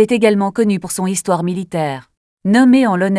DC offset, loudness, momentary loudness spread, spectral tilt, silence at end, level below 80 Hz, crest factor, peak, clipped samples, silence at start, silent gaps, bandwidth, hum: under 0.1%; -15 LUFS; 11 LU; -5.5 dB/octave; 0 s; -58 dBFS; 14 dB; 0 dBFS; under 0.1%; 0 s; 2.17-2.37 s; 11 kHz; none